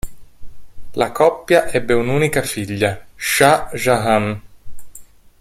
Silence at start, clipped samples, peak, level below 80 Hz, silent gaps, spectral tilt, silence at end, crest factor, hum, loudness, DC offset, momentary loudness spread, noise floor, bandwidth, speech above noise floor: 0.05 s; under 0.1%; 0 dBFS; -40 dBFS; none; -4.5 dB/octave; 0.35 s; 18 dB; none; -17 LUFS; under 0.1%; 11 LU; -40 dBFS; 16.5 kHz; 24 dB